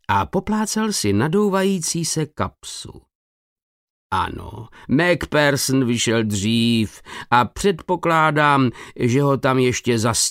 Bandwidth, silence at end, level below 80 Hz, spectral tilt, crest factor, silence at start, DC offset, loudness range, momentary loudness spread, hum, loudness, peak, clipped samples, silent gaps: 16 kHz; 0 s; -46 dBFS; -4.5 dB/octave; 18 dB; 0.1 s; under 0.1%; 6 LU; 11 LU; none; -19 LUFS; -2 dBFS; under 0.1%; 3.15-3.56 s, 3.63-4.10 s